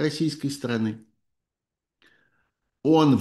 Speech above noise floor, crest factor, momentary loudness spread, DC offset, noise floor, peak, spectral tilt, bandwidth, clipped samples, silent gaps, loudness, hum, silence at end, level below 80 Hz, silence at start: 65 dB; 18 dB; 11 LU; under 0.1%; -88 dBFS; -8 dBFS; -6.5 dB/octave; 12.5 kHz; under 0.1%; none; -25 LUFS; none; 0 s; -68 dBFS; 0 s